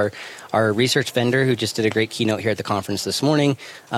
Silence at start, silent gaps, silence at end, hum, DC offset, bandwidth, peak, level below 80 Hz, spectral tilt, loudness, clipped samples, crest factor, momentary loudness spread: 0 s; none; 0 s; none; under 0.1%; 16 kHz; -4 dBFS; -64 dBFS; -5 dB/octave; -20 LUFS; under 0.1%; 16 dB; 6 LU